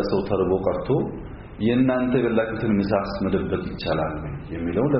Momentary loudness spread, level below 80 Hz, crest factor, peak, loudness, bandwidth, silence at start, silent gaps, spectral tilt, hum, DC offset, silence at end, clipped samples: 10 LU; -42 dBFS; 16 dB; -8 dBFS; -23 LUFS; 5.8 kHz; 0 s; none; -6.5 dB/octave; none; under 0.1%; 0 s; under 0.1%